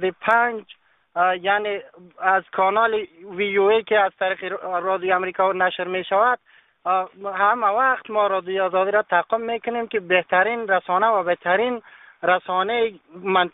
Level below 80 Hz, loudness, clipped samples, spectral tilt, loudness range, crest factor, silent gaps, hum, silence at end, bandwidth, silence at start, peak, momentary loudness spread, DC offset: -68 dBFS; -21 LUFS; under 0.1%; -1.5 dB/octave; 1 LU; 18 dB; none; none; 0.05 s; 4 kHz; 0 s; -4 dBFS; 8 LU; under 0.1%